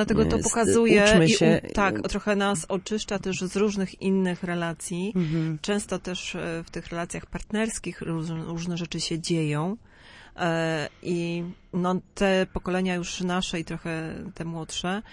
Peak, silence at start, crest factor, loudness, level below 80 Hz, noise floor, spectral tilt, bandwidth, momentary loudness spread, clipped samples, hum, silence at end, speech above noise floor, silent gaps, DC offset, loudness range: -6 dBFS; 0 s; 20 dB; -26 LUFS; -46 dBFS; -50 dBFS; -5 dB/octave; 11.5 kHz; 12 LU; under 0.1%; none; 0 s; 24 dB; none; under 0.1%; 8 LU